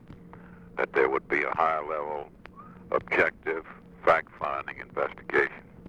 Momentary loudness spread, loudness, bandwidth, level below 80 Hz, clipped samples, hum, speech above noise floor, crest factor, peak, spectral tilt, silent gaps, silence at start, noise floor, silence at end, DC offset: 23 LU; -28 LUFS; 10 kHz; -58 dBFS; under 0.1%; none; 20 dB; 20 dB; -10 dBFS; -6 dB/octave; none; 0.1 s; -48 dBFS; 0 s; under 0.1%